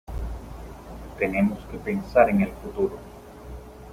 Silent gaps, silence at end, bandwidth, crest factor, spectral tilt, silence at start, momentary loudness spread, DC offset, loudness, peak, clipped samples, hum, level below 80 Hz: none; 0 s; 15.5 kHz; 22 dB; -8 dB/octave; 0.1 s; 22 LU; under 0.1%; -25 LUFS; -4 dBFS; under 0.1%; none; -40 dBFS